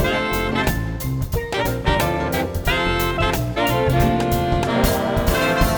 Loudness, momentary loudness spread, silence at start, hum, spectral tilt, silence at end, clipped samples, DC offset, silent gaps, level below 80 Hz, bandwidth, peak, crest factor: -20 LUFS; 5 LU; 0 s; none; -5.5 dB/octave; 0 s; under 0.1%; under 0.1%; none; -28 dBFS; over 20 kHz; -2 dBFS; 16 dB